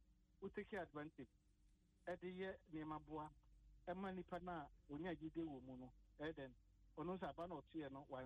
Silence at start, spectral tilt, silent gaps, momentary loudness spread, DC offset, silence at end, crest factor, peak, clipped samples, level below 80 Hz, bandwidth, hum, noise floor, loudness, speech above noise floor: 0 s; -8 dB/octave; none; 9 LU; under 0.1%; 0 s; 14 dB; -38 dBFS; under 0.1%; -72 dBFS; 9 kHz; none; -76 dBFS; -53 LUFS; 24 dB